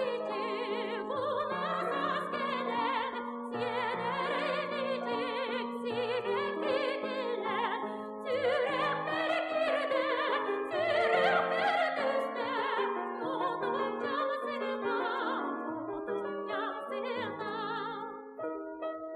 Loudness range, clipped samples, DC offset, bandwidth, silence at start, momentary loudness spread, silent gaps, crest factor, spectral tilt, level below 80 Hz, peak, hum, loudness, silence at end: 5 LU; under 0.1%; under 0.1%; 11.5 kHz; 0 s; 7 LU; none; 18 dB; -5 dB/octave; -76 dBFS; -14 dBFS; none; -33 LUFS; 0 s